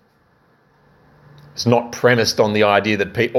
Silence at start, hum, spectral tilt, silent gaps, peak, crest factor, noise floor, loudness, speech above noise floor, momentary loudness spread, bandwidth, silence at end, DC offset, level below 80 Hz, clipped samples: 1.55 s; none; -4.5 dB/octave; none; 0 dBFS; 18 dB; -57 dBFS; -17 LUFS; 41 dB; 6 LU; 15.5 kHz; 0 s; under 0.1%; -56 dBFS; under 0.1%